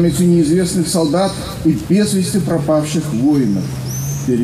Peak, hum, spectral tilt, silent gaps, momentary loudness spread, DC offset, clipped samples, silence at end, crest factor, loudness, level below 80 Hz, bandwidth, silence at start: -2 dBFS; none; -6 dB/octave; none; 7 LU; under 0.1%; under 0.1%; 0 s; 12 dB; -16 LUFS; -38 dBFS; 15.5 kHz; 0 s